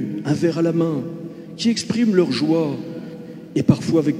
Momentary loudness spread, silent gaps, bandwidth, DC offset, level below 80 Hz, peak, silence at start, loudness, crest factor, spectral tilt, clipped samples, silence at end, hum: 16 LU; none; 12.5 kHz; under 0.1%; -56 dBFS; -2 dBFS; 0 s; -20 LUFS; 18 dB; -6.5 dB/octave; under 0.1%; 0 s; none